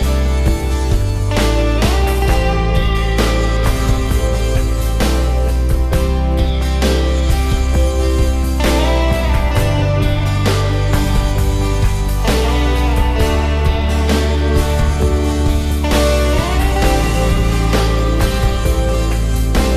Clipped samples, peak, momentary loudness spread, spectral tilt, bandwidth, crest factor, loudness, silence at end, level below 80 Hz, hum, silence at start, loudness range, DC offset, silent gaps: under 0.1%; -2 dBFS; 2 LU; -5.5 dB/octave; 14 kHz; 12 dB; -16 LUFS; 0 s; -16 dBFS; none; 0 s; 1 LU; under 0.1%; none